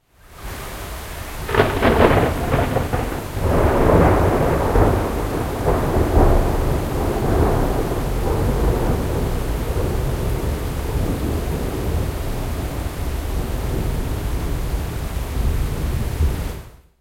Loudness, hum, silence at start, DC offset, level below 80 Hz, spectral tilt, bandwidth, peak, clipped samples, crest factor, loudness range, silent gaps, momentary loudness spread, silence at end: -21 LUFS; none; 0.3 s; under 0.1%; -24 dBFS; -6.5 dB/octave; 16.5 kHz; 0 dBFS; under 0.1%; 20 dB; 7 LU; none; 11 LU; 0.3 s